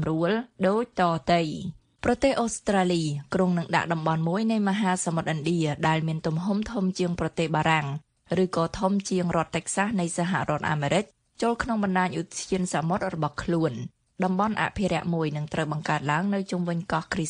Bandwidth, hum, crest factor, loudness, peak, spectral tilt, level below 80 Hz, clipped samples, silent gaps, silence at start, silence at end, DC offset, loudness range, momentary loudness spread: 10.5 kHz; none; 18 dB; -26 LUFS; -8 dBFS; -5.5 dB/octave; -52 dBFS; under 0.1%; none; 0 s; 0 s; under 0.1%; 2 LU; 5 LU